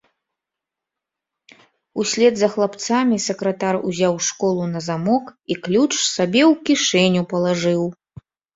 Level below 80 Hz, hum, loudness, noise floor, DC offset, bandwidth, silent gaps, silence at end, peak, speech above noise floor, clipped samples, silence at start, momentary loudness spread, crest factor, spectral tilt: -60 dBFS; none; -19 LUFS; -85 dBFS; under 0.1%; 8 kHz; none; 0.6 s; -2 dBFS; 66 dB; under 0.1%; 1.95 s; 8 LU; 18 dB; -4 dB/octave